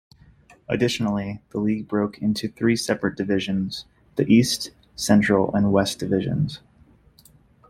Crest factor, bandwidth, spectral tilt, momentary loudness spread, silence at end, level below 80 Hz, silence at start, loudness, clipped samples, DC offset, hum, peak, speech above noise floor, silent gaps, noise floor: 18 dB; 15.5 kHz; -5.5 dB/octave; 11 LU; 1.1 s; -52 dBFS; 0.7 s; -23 LUFS; under 0.1%; under 0.1%; none; -4 dBFS; 33 dB; none; -55 dBFS